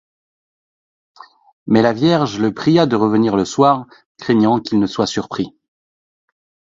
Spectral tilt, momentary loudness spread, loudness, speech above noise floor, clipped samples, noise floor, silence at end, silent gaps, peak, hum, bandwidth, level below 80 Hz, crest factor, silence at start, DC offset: -6.5 dB/octave; 11 LU; -16 LUFS; over 75 dB; under 0.1%; under -90 dBFS; 1.25 s; 4.06-4.15 s; 0 dBFS; none; 7.8 kHz; -54 dBFS; 18 dB; 1.65 s; under 0.1%